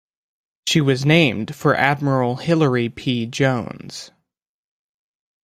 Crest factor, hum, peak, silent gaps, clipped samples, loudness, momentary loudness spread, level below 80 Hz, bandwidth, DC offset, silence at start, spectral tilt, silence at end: 18 dB; none; -2 dBFS; none; under 0.1%; -19 LUFS; 14 LU; -56 dBFS; 15 kHz; under 0.1%; 0.65 s; -5.5 dB/octave; 1.4 s